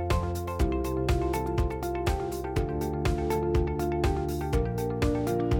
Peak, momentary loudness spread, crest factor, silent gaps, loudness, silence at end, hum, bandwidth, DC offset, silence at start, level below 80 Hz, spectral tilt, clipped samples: -14 dBFS; 3 LU; 12 dB; none; -29 LUFS; 0 s; none; 19 kHz; under 0.1%; 0 s; -34 dBFS; -7 dB/octave; under 0.1%